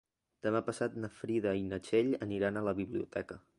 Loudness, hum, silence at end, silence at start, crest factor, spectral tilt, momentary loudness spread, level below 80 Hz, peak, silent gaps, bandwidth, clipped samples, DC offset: -35 LUFS; none; 0.2 s; 0.45 s; 18 dB; -6.5 dB/octave; 8 LU; -64 dBFS; -18 dBFS; none; 11.5 kHz; under 0.1%; under 0.1%